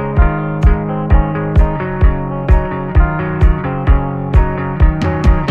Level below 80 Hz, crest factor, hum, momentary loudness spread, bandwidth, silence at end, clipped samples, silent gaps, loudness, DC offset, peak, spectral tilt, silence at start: -14 dBFS; 12 dB; none; 2 LU; 5.8 kHz; 0 s; under 0.1%; none; -15 LUFS; under 0.1%; 0 dBFS; -9 dB/octave; 0 s